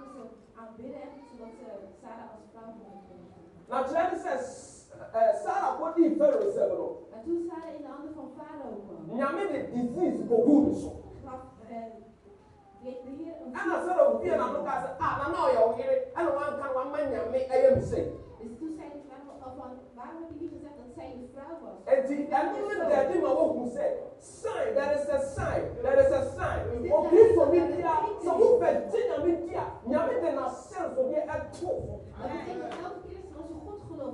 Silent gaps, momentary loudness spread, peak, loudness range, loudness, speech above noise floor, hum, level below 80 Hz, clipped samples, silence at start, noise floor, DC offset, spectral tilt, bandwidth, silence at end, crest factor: none; 22 LU; -6 dBFS; 12 LU; -28 LUFS; 27 dB; none; -54 dBFS; under 0.1%; 0 s; -56 dBFS; under 0.1%; -7 dB/octave; 11 kHz; 0 s; 24 dB